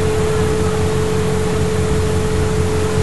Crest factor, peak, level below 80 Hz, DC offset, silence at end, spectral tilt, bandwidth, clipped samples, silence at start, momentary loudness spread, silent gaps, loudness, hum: 12 dB; -4 dBFS; -28 dBFS; 6%; 0 s; -6 dB/octave; 12 kHz; under 0.1%; 0 s; 1 LU; none; -17 LUFS; none